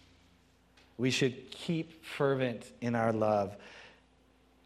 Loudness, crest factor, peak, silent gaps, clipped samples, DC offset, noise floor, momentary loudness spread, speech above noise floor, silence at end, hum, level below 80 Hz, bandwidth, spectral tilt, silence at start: -33 LUFS; 18 dB; -16 dBFS; none; under 0.1%; under 0.1%; -66 dBFS; 19 LU; 33 dB; 0.8 s; none; -70 dBFS; 14 kHz; -5.5 dB/octave; 1 s